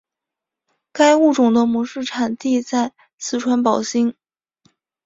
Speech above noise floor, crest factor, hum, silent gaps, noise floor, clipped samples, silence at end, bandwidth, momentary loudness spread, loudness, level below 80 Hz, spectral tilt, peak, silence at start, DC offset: 68 dB; 18 dB; none; 3.14-3.18 s; -85 dBFS; under 0.1%; 0.95 s; 7.8 kHz; 11 LU; -18 LUFS; -62 dBFS; -4 dB/octave; -2 dBFS; 0.95 s; under 0.1%